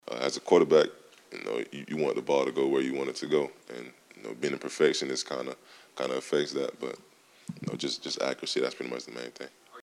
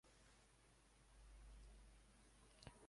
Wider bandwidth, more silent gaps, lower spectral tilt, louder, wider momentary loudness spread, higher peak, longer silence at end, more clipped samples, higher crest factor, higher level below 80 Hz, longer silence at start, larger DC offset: first, 13 kHz vs 11.5 kHz; neither; about the same, -4 dB/octave vs -4 dB/octave; first, -30 LUFS vs -67 LUFS; first, 20 LU vs 4 LU; first, -8 dBFS vs -40 dBFS; about the same, 0 s vs 0 s; neither; second, 22 dB vs 28 dB; second, -76 dBFS vs -68 dBFS; about the same, 0.05 s vs 0.05 s; neither